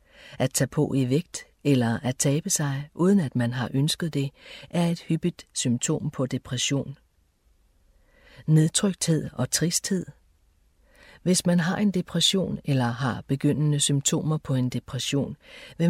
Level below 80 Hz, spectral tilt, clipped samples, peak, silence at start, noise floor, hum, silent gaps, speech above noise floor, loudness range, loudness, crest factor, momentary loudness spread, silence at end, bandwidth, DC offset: -56 dBFS; -4.5 dB/octave; under 0.1%; -8 dBFS; 0.2 s; -64 dBFS; none; none; 39 dB; 4 LU; -25 LUFS; 18 dB; 8 LU; 0 s; 16 kHz; under 0.1%